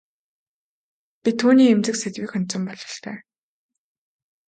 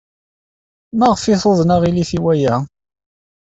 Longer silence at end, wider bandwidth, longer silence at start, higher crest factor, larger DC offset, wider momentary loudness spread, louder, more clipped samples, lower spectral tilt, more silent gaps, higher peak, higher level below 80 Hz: first, 1.3 s vs 0.9 s; first, 9.4 kHz vs 8 kHz; first, 1.25 s vs 0.95 s; about the same, 18 dB vs 14 dB; neither; first, 18 LU vs 8 LU; second, -20 LUFS vs -15 LUFS; neither; second, -5 dB/octave vs -6.5 dB/octave; neither; second, -6 dBFS vs -2 dBFS; second, -72 dBFS vs -46 dBFS